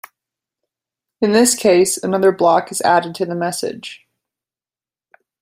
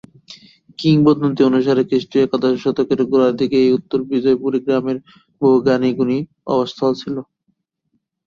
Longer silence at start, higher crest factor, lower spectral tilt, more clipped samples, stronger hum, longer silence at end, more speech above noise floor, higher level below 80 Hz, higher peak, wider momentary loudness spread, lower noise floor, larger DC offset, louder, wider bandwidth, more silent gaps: first, 1.2 s vs 0.3 s; about the same, 18 dB vs 16 dB; second, -3.5 dB/octave vs -8 dB/octave; neither; neither; first, 1.45 s vs 1.05 s; first, over 75 dB vs 54 dB; about the same, -62 dBFS vs -58 dBFS; about the same, -2 dBFS vs -2 dBFS; first, 12 LU vs 7 LU; first, under -90 dBFS vs -70 dBFS; neither; about the same, -16 LUFS vs -17 LUFS; first, 16 kHz vs 7.2 kHz; neither